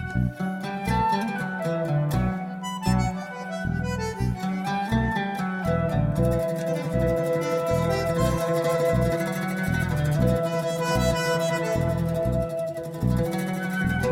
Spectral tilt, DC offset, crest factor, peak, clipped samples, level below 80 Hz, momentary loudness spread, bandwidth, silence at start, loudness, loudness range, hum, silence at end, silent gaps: -6.5 dB/octave; under 0.1%; 16 dB; -10 dBFS; under 0.1%; -38 dBFS; 6 LU; 16.5 kHz; 0 s; -25 LUFS; 3 LU; none; 0 s; none